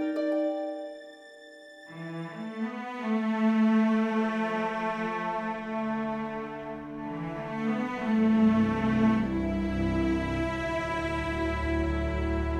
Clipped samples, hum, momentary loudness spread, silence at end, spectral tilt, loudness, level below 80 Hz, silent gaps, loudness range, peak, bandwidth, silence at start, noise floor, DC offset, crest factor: under 0.1%; none; 15 LU; 0 s; -7.5 dB/octave; -29 LUFS; -42 dBFS; none; 6 LU; -12 dBFS; 9.2 kHz; 0 s; -49 dBFS; under 0.1%; 16 dB